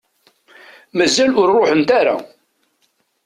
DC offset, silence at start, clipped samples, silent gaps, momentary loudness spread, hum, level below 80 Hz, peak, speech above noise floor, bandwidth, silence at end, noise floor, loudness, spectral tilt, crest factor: under 0.1%; 0.95 s; under 0.1%; none; 9 LU; none; -58 dBFS; -4 dBFS; 51 dB; 13 kHz; 1 s; -64 dBFS; -15 LUFS; -3.5 dB/octave; 14 dB